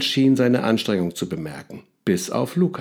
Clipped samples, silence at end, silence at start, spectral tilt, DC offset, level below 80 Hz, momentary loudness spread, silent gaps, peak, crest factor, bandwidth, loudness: under 0.1%; 0 s; 0 s; -5.5 dB/octave; under 0.1%; -60 dBFS; 15 LU; none; -6 dBFS; 16 dB; 17.5 kHz; -21 LUFS